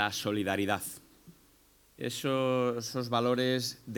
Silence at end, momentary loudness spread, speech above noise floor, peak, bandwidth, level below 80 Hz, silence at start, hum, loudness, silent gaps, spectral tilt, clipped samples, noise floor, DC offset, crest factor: 0 s; 10 LU; 32 dB; -12 dBFS; 19.5 kHz; -70 dBFS; 0 s; none; -31 LUFS; none; -4.5 dB/octave; under 0.1%; -63 dBFS; under 0.1%; 20 dB